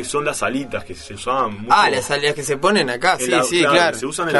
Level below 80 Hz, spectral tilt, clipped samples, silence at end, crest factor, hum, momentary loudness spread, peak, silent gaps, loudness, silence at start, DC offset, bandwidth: -48 dBFS; -3 dB/octave; under 0.1%; 0 s; 18 dB; none; 11 LU; 0 dBFS; none; -17 LUFS; 0 s; under 0.1%; 12 kHz